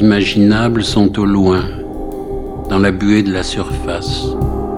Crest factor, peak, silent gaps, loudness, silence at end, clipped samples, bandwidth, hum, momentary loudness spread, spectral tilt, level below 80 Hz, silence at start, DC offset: 14 dB; 0 dBFS; none; -15 LUFS; 0 s; under 0.1%; 12 kHz; none; 13 LU; -6 dB/octave; -28 dBFS; 0 s; 0.2%